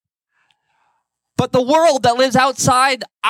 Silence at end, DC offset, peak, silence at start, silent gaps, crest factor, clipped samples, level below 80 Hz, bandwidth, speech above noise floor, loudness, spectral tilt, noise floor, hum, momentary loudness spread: 0 s; under 0.1%; -2 dBFS; 1.4 s; none; 16 dB; under 0.1%; -54 dBFS; 16.5 kHz; 53 dB; -15 LUFS; -3.5 dB/octave; -68 dBFS; none; 6 LU